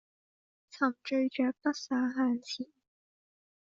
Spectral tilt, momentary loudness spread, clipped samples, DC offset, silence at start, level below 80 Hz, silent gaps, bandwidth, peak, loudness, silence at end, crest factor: -2 dB/octave; 10 LU; under 0.1%; under 0.1%; 0.75 s; -80 dBFS; none; 7.4 kHz; -14 dBFS; -32 LUFS; 0.95 s; 20 dB